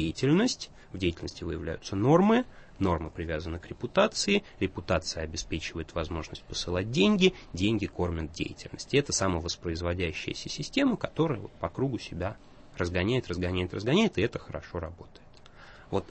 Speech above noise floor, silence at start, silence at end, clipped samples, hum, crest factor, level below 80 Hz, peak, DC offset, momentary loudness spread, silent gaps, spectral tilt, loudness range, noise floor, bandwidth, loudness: 21 dB; 0 s; 0 s; under 0.1%; none; 20 dB; -48 dBFS; -8 dBFS; under 0.1%; 12 LU; none; -5 dB/octave; 3 LU; -51 dBFS; 8.8 kHz; -29 LUFS